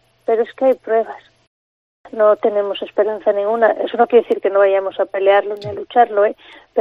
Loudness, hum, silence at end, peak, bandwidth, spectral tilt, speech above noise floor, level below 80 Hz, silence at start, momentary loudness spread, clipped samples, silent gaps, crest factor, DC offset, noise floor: -16 LUFS; none; 0 s; 0 dBFS; 5.2 kHz; -6.5 dB/octave; over 74 dB; -66 dBFS; 0.3 s; 10 LU; under 0.1%; 1.47-2.04 s; 16 dB; under 0.1%; under -90 dBFS